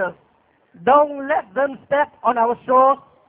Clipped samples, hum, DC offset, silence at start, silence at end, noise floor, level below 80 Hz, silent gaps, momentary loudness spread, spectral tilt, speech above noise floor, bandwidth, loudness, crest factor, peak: under 0.1%; none; under 0.1%; 0 s; 0.35 s; -59 dBFS; -62 dBFS; none; 8 LU; -8.5 dB/octave; 42 dB; 3.8 kHz; -18 LUFS; 16 dB; -4 dBFS